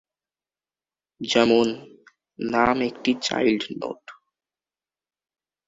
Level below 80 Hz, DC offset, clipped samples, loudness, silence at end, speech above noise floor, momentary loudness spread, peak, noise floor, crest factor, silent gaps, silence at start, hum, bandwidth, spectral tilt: -58 dBFS; under 0.1%; under 0.1%; -22 LUFS; 1.55 s; over 68 dB; 16 LU; -6 dBFS; under -90 dBFS; 20 dB; none; 1.2 s; none; 8 kHz; -4 dB/octave